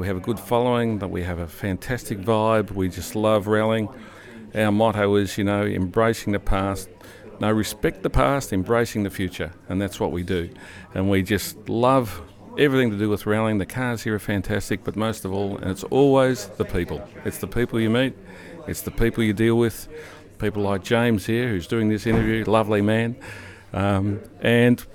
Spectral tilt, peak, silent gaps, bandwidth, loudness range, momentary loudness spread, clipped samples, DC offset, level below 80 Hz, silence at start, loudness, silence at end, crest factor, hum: -6 dB/octave; -4 dBFS; none; 18.5 kHz; 2 LU; 13 LU; under 0.1%; under 0.1%; -38 dBFS; 0 s; -23 LUFS; 0.1 s; 18 dB; none